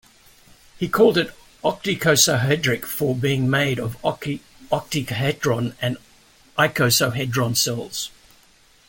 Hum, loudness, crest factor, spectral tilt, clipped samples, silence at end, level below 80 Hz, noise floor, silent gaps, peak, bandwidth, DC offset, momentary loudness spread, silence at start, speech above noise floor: none; -21 LUFS; 20 dB; -4 dB/octave; under 0.1%; 0.8 s; -52 dBFS; -54 dBFS; none; -4 dBFS; 17 kHz; under 0.1%; 13 LU; 0.75 s; 34 dB